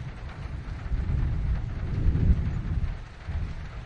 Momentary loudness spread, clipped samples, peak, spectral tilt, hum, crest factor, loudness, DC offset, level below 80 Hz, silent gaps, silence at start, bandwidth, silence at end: 12 LU; under 0.1%; -10 dBFS; -8.5 dB/octave; none; 18 dB; -31 LUFS; under 0.1%; -30 dBFS; none; 0 s; 6.8 kHz; 0 s